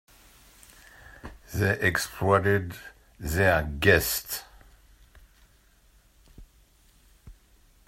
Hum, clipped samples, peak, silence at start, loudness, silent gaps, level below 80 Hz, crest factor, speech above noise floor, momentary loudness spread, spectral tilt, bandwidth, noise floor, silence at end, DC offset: none; under 0.1%; -6 dBFS; 1.25 s; -25 LUFS; none; -48 dBFS; 24 dB; 36 dB; 24 LU; -4.5 dB/octave; 16 kHz; -60 dBFS; 0.55 s; under 0.1%